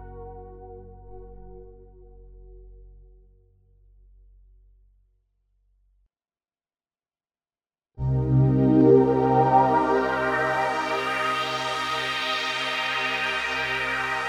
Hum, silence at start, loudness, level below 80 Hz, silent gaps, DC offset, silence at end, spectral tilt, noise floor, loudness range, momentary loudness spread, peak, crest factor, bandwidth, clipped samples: none; 0 s; -22 LUFS; -46 dBFS; none; under 0.1%; 0 s; -6 dB/octave; under -90 dBFS; 7 LU; 16 LU; -4 dBFS; 22 dB; 13 kHz; under 0.1%